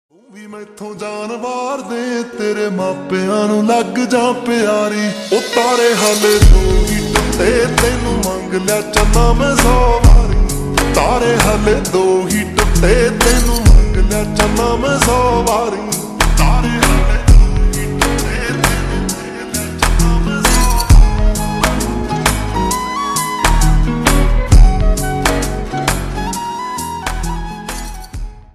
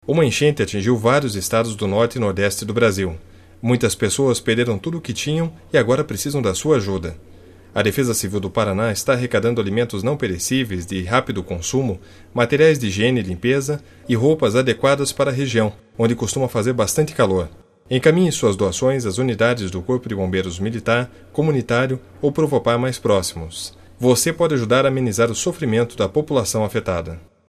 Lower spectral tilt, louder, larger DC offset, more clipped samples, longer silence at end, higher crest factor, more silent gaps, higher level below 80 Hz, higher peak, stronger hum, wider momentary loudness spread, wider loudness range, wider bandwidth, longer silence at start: about the same, -4.5 dB/octave vs -5 dB/octave; first, -14 LUFS vs -19 LUFS; neither; neither; about the same, 0.15 s vs 0.25 s; second, 12 dB vs 20 dB; neither; first, -16 dBFS vs -46 dBFS; about the same, 0 dBFS vs 0 dBFS; neither; about the same, 10 LU vs 8 LU; about the same, 4 LU vs 2 LU; about the same, 14.5 kHz vs 14 kHz; first, 0.35 s vs 0.05 s